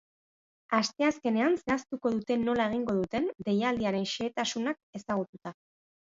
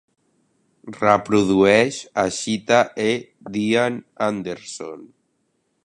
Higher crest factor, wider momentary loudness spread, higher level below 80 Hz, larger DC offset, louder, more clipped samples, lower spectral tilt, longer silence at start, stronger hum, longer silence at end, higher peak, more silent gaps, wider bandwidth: about the same, 20 dB vs 20 dB; second, 7 LU vs 17 LU; second, -64 dBFS vs -56 dBFS; neither; second, -30 LUFS vs -20 LUFS; neither; about the same, -5 dB/octave vs -4.5 dB/octave; second, 0.7 s vs 0.85 s; neither; second, 0.6 s vs 0.8 s; second, -12 dBFS vs 0 dBFS; first, 4.83-4.93 s, 5.29-5.33 s vs none; second, 7.8 kHz vs 11.5 kHz